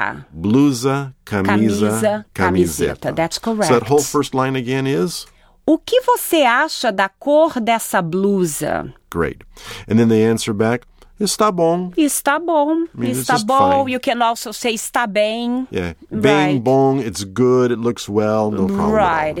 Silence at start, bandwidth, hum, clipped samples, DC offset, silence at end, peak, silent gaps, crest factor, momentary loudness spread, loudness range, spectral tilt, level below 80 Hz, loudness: 0 s; 18 kHz; none; under 0.1%; under 0.1%; 0 s; -2 dBFS; none; 16 dB; 9 LU; 2 LU; -5 dB/octave; -46 dBFS; -17 LUFS